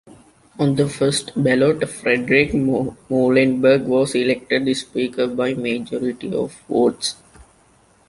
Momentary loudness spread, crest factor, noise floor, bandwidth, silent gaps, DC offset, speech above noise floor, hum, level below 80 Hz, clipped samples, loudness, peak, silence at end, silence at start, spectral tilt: 9 LU; 18 dB; -55 dBFS; 11.5 kHz; none; under 0.1%; 36 dB; none; -50 dBFS; under 0.1%; -19 LUFS; -2 dBFS; 0.65 s; 0.05 s; -5.5 dB/octave